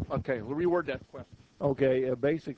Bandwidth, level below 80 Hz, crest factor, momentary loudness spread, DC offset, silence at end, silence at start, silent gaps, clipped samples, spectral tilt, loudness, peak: 8 kHz; -52 dBFS; 16 dB; 13 LU; under 0.1%; 0.05 s; 0 s; none; under 0.1%; -9 dB/octave; -30 LUFS; -14 dBFS